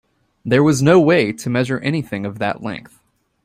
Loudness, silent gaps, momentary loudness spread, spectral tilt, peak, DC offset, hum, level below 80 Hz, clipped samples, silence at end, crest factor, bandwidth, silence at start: -17 LUFS; none; 16 LU; -6 dB/octave; -2 dBFS; under 0.1%; none; -52 dBFS; under 0.1%; 0.65 s; 16 dB; 15.5 kHz; 0.45 s